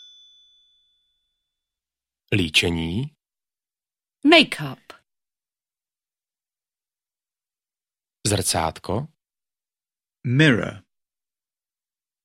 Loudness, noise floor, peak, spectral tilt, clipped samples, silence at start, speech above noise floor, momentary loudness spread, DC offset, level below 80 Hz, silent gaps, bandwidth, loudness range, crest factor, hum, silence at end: -20 LUFS; under -90 dBFS; 0 dBFS; -4 dB/octave; under 0.1%; 2.3 s; over 70 dB; 19 LU; under 0.1%; -52 dBFS; none; 16 kHz; 7 LU; 26 dB; none; 1.45 s